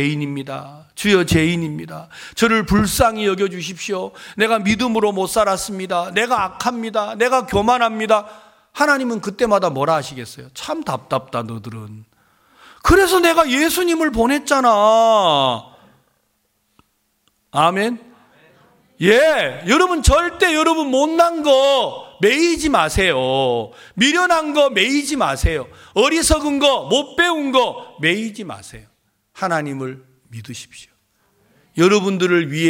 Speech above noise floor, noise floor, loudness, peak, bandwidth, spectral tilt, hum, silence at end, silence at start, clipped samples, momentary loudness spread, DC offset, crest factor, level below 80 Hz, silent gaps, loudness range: 49 dB; -66 dBFS; -17 LUFS; 0 dBFS; 17 kHz; -4 dB/octave; none; 0 s; 0 s; under 0.1%; 17 LU; under 0.1%; 18 dB; -34 dBFS; none; 7 LU